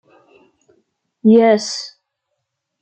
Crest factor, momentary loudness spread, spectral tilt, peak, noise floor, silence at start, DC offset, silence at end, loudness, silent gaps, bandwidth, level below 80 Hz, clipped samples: 16 dB; 16 LU; -5 dB/octave; -2 dBFS; -75 dBFS; 1.25 s; under 0.1%; 0.95 s; -14 LUFS; none; 8.8 kHz; -68 dBFS; under 0.1%